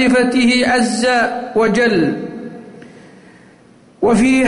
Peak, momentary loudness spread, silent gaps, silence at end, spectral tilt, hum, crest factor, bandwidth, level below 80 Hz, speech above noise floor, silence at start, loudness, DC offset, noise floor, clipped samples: -4 dBFS; 16 LU; none; 0 s; -4.5 dB/octave; none; 10 dB; 11 kHz; -46 dBFS; 33 dB; 0 s; -14 LUFS; under 0.1%; -46 dBFS; under 0.1%